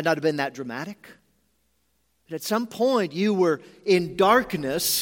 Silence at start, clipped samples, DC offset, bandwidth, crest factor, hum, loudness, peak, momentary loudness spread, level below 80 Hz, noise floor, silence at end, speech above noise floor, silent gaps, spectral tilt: 0 s; under 0.1%; under 0.1%; 17 kHz; 20 dB; none; -24 LUFS; -4 dBFS; 14 LU; -60 dBFS; -70 dBFS; 0 s; 47 dB; none; -4 dB/octave